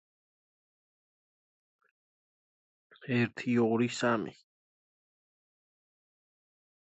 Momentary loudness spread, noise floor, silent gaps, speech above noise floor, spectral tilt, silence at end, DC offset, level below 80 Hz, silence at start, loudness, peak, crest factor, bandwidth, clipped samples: 11 LU; under -90 dBFS; none; over 60 dB; -6 dB/octave; 2.55 s; under 0.1%; -78 dBFS; 3 s; -30 LUFS; -16 dBFS; 22 dB; 8.2 kHz; under 0.1%